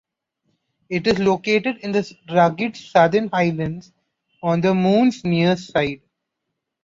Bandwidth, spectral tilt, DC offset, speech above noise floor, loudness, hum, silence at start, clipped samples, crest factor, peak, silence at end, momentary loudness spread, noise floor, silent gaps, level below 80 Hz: 7.6 kHz; -6.5 dB/octave; under 0.1%; 60 dB; -19 LUFS; none; 0.9 s; under 0.1%; 18 dB; -2 dBFS; 0.85 s; 10 LU; -79 dBFS; none; -56 dBFS